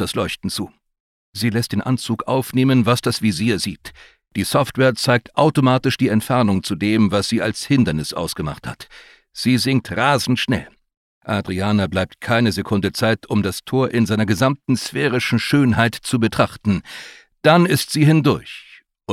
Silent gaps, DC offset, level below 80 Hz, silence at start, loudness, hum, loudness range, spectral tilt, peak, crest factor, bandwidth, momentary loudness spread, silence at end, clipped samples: 1.00-1.33 s, 10.97-11.21 s; under 0.1%; -48 dBFS; 0 s; -18 LUFS; none; 3 LU; -5.5 dB/octave; -2 dBFS; 18 dB; 16 kHz; 11 LU; 0 s; under 0.1%